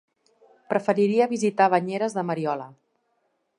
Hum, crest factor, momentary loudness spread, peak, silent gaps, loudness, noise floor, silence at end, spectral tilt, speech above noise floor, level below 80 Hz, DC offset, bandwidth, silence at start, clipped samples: none; 20 dB; 8 LU; -6 dBFS; none; -24 LUFS; -72 dBFS; 0.9 s; -6 dB/octave; 49 dB; -78 dBFS; under 0.1%; 11 kHz; 0.7 s; under 0.1%